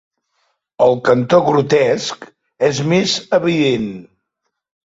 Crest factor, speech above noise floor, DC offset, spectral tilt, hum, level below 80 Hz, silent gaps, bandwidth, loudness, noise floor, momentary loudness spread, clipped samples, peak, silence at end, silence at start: 16 dB; 60 dB; under 0.1%; -5 dB/octave; none; -56 dBFS; none; 8 kHz; -15 LUFS; -75 dBFS; 11 LU; under 0.1%; 0 dBFS; 0.8 s; 0.8 s